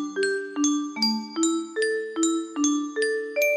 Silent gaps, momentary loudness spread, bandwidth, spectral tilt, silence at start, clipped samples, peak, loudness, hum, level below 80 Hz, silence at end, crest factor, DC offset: none; 2 LU; 13 kHz; -2 dB/octave; 0 s; under 0.1%; -10 dBFS; -25 LUFS; none; -74 dBFS; 0 s; 14 dB; under 0.1%